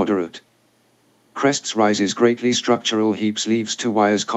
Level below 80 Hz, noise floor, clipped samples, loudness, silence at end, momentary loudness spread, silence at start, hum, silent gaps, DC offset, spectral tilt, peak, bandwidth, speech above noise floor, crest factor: -76 dBFS; -60 dBFS; under 0.1%; -19 LUFS; 0 s; 4 LU; 0 s; none; none; under 0.1%; -3.5 dB/octave; -4 dBFS; 8.4 kHz; 41 dB; 18 dB